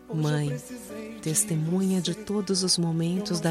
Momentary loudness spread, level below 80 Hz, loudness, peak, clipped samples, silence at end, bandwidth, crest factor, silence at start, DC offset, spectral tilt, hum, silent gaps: 12 LU; -60 dBFS; -26 LUFS; -8 dBFS; under 0.1%; 0 s; 16 kHz; 18 dB; 0 s; under 0.1%; -4.5 dB/octave; none; none